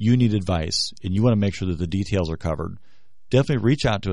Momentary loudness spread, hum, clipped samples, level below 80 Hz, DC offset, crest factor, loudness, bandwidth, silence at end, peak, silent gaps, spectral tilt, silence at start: 8 LU; none; under 0.1%; -40 dBFS; 1%; 18 dB; -22 LUFS; 11 kHz; 0 s; -4 dBFS; none; -6 dB/octave; 0 s